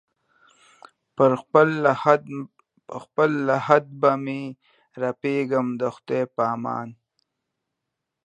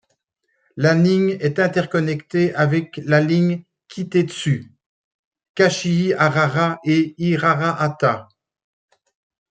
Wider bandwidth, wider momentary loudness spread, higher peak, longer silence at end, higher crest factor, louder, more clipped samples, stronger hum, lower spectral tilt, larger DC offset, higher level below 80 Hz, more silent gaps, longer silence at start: about the same, 9 kHz vs 9 kHz; first, 17 LU vs 7 LU; about the same, 0 dBFS vs -2 dBFS; about the same, 1.35 s vs 1.25 s; first, 24 dB vs 18 dB; second, -22 LUFS vs -19 LUFS; neither; neither; about the same, -7.5 dB/octave vs -6.5 dB/octave; neither; second, -74 dBFS vs -62 dBFS; second, none vs 4.86-5.31 s, 5.49-5.54 s; first, 1.2 s vs 0.75 s